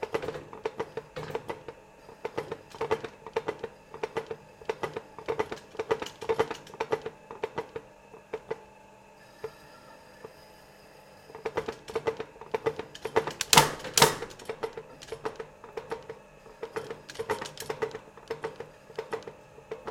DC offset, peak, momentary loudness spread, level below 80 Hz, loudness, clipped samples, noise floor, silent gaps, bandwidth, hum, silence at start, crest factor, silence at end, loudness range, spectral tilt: under 0.1%; -2 dBFS; 19 LU; -62 dBFS; -32 LUFS; under 0.1%; -54 dBFS; none; 16.5 kHz; none; 0 s; 32 dB; 0 s; 16 LU; -2.5 dB/octave